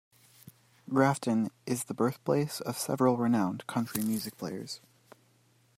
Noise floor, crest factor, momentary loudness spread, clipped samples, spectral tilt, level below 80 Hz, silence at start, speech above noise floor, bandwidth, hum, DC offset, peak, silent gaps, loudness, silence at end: -66 dBFS; 20 dB; 11 LU; under 0.1%; -5.5 dB/octave; -72 dBFS; 0.85 s; 36 dB; 16 kHz; none; under 0.1%; -10 dBFS; none; -31 LUFS; 1 s